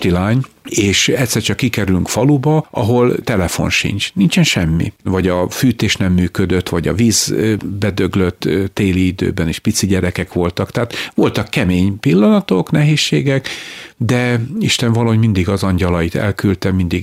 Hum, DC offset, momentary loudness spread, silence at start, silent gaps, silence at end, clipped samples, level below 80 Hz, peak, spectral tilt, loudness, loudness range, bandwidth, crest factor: none; under 0.1%; 6 LU; 0 s; none; 0 s; under 0.1%; -38 dBFS; -2 dBFS; -5 dB/octave; -15 LUFS; 2 LU; 16 kHz; 12 dB